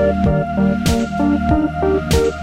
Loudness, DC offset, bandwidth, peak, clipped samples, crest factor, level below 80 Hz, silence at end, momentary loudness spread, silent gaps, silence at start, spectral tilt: -17 LUFS; under 0.1%; 16 kHz; -2 dBFS; under 0.1%; 14 dB; -26 dBFS; 0 s; 2 LU; none; 0 s; -6.5 dB/octave